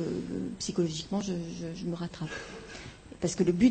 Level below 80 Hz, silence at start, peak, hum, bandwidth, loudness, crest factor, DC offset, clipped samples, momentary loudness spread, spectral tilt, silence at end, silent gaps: -54 dBFS; 0 s; -12 dBFS; none; 8.8 kHz; -33 LUFS; 20 dB; under 0.1%; under 0.1%; 15 LU; -5.5 dB/octave; 0 s; none